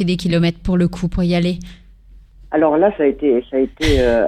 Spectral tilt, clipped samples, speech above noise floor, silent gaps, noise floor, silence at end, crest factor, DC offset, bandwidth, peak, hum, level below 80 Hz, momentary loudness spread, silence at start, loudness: -7 dB/octave; under 0.1%; 27 dB; none; -43 dBFS; 0 s; 14 dB; under 0.1%; 12 kHz; -2 dBFS; none; -30 dBFS; 6 LU; 0 s; -17 LUFS